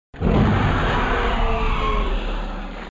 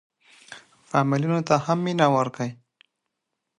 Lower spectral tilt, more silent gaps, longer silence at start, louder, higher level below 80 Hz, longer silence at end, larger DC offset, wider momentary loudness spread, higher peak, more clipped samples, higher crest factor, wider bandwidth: about the same, -7 dB/octave vs -6.5 dB/octave; neither; second, 0.15 s vs 0.5 s; about the same, -21 LUFS vs -23 LUFS; first, -24 dBFS vs -68 dBFS; second, 0 s vs 1.05 s; neither; second, 11 LU vs 24 LU; about the same, -6 dBFS vs -4 dBFS; neither; second, 14 dB vs 20 dB; second, 7.6 kHz vs 10.5 kHz